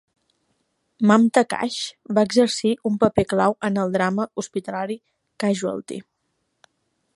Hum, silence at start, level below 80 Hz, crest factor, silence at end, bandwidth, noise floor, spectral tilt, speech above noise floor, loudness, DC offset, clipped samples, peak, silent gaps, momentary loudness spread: none; 1 s; -56 dBFS; 22 dB; 1.15 s; 11.5 kHz; -73 dBFS; -5.5 dB/octave; 53 dB; -21 LUFS; under 0.1%; under 0.1%; -2 dBFS; none; 12 LU